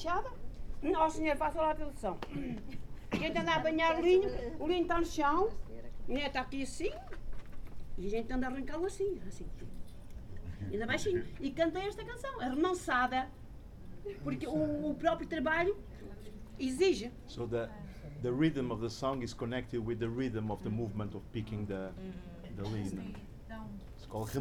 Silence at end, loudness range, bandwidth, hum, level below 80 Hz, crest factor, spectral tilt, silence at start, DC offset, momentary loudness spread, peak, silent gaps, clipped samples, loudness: 0 s; 8 LU; 16 kHz; none; -48 dBFS; 18 dB; -5.5 dB/octave; 0 s; under 0.1%; 19 LU; -16 dBFS; none; under 0.1%; -35 LUFS